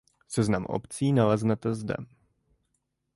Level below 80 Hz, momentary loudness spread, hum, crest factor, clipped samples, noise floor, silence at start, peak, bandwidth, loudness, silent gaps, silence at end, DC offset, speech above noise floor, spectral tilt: -56 dBFS; 11 LU; none; 18 dB; under 0.1%; -78 dBFS; 0.3 s; -10 dBFS; 11.5 kHz; -28 LUFS; none; 1.1 s; under 0.1%; 51 dB; -7 dB/octave